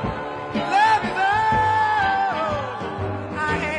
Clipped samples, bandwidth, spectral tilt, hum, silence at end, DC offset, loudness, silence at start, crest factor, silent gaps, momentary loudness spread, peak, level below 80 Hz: under 0.1%; 10.5 kHz; -5 dB/octave; none; 0 s; under 0.1%; -21 LUFS; 0 s; 14 dB; none; 10 LU; -8 dBFS; -46 dBFS